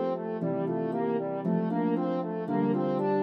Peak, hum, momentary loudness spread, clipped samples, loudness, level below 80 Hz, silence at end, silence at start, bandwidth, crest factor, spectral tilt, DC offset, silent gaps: -16 dBFS; none; 4 LU; under 0.1%; -29 LUFS; -82 dBFS; 0 s; 0 s; 5.6 kHz; 12 dB; -10.5 dB/octave; under 0.1%; none